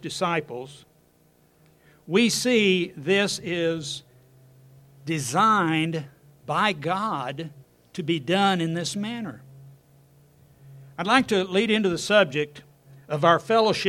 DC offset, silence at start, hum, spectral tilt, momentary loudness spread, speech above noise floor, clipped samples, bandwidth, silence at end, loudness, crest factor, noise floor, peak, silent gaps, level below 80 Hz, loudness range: under 0.1%; 0.05 s; none; -4.5 dB/octave; 17 LU; 37 dB; under 0.1%; 16 kHz; 0 s; -23 LUFS; 22 dB; -61 dBFS; -4 dBFS; none; -64 dBFS; 4 LU